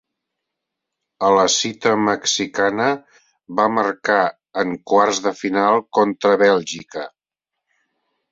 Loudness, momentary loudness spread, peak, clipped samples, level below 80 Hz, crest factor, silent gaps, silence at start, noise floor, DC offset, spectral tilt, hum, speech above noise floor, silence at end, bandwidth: -18 LUFS; 11 LU; -2 dBFS; under 0.1%; -64 dBFS; 18 dB; none; 1.2 s; -83 dBFS; under 0.1%; -3 dB/octave; none; 66 dB; 1.25 s; 7.8 kHz